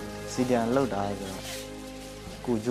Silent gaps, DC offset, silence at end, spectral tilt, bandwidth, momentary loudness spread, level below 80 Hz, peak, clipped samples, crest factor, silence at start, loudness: none; under 0.1%; 0 s; -5.5 dB/octave; 15.5 kHz; 15 LU; -50 dBFS; -10 dBFS; under 0.1%; 20 dB; 0 s; -30 LUFS